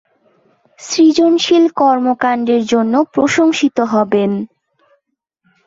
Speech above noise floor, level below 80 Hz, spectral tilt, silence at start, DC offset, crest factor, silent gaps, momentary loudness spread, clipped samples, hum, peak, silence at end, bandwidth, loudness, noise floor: 56 dB; -60 dBFS; -4.5 dB/octave; 0.8 s; under 0.1%; 12 dB; none; 8 LU; under 0.1%; none; -2 dBFS; 1.2 s; 7.8 kHz; -13 LUFS; -69 dBFS